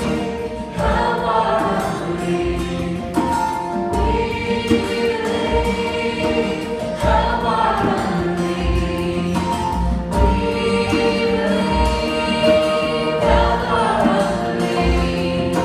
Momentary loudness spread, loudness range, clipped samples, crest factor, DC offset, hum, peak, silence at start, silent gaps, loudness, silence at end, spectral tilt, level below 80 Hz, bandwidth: 6 LU; 3 LU; under 0.1%; 16 dB; under 0.1%; none; -2 dBFS; 0 s; none; -19 LUFS; 0 s; -6 dB/octave; -28 dBFS; 14 kHz